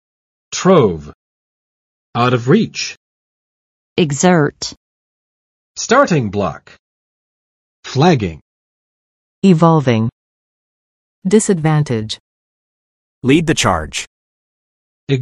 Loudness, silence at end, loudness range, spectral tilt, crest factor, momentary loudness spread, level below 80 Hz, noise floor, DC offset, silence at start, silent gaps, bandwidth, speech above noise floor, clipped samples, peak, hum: -15 LUFS; 0 s; 4 LU; -5.5 dB/octave; 18 dB; 14 LU; -46 dBFS; under -90 dBFS; under 0.1%; 0.5 s; 1.15-2.13 s, 2.97-3.96 s, 4.77-5.75 s, 6.79-7.83 s, 8.41-9.42 s, 10.12-11.22 s, 12.20-13.21 s, 14.07-15.07 s; 12 kHz; over 77 dB; under 0.1%; 0 dBFS; none